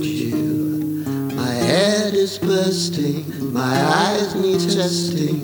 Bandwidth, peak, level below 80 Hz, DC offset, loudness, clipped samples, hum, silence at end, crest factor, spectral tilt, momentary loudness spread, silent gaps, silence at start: over 20 kHz; -2 dBFS; -56 dBFS; under 0.1%; -19 LUFS; under 0.1%; none; 0 s; 18 dB; -5 dB/octave; 7 LU; none; 0 s